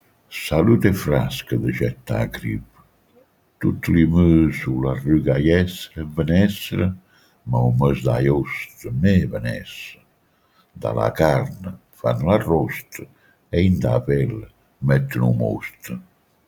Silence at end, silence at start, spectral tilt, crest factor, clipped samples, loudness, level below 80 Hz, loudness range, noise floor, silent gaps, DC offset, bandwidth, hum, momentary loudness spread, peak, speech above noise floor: 0.45 s; 0.3 s; -7.5 dB/octave; 20 dB; under 0.1%; -20 LUFS; -40 dBFS; 4 LU; -61 dBFS; none; under 0.1%; 19.5 kHz; none; 15 LU; -2 dBFS; 42 dB